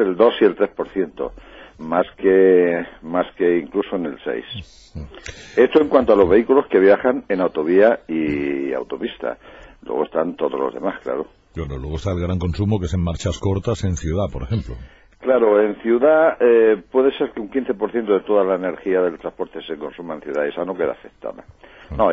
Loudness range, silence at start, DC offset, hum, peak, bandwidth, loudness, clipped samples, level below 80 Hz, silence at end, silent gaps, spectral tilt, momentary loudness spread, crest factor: 8 LU; 0 s; under 0.1%; none; -2 dBFS; 7.8 kHz; -19 LUFS; under 0.1%; -42 dBFS; 0 s; none; -7 dB/octave; 16 LU; 16 dB